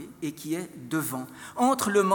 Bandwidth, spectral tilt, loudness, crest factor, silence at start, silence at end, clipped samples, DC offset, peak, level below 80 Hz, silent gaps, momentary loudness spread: 18 kHz; -4.5 dB/octave; -28 LUFS; 16 dB; 0 s; 0 s; under 0.1%; under 0.1%; -10 dBFS; -70 dBFS; none; 13 LU